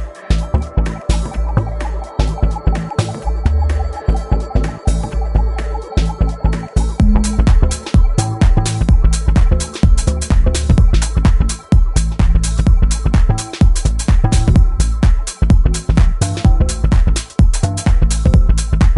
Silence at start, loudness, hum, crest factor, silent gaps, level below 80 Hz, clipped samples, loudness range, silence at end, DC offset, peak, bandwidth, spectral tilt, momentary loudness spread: 0 s; -16 LUFS; none; 12 dB; none; -14 dBFS; under 0.1%; 4 LU; 0 s; under 0.1%; 0 dBFS; 11.5 kHz; -6 dB/octave; 6 LU